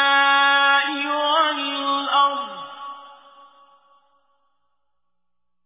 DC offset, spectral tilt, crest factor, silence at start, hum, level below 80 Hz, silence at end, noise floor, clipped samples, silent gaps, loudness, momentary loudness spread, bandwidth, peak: under 0.1%; -4 dB/octave; 16 dB; 0 s; none; -78 dBFS; 2.55 s; -83 dBFS; under 0.1%; none; -18 LUFS; 20 LU; 3.9 kHz; -6 dBFS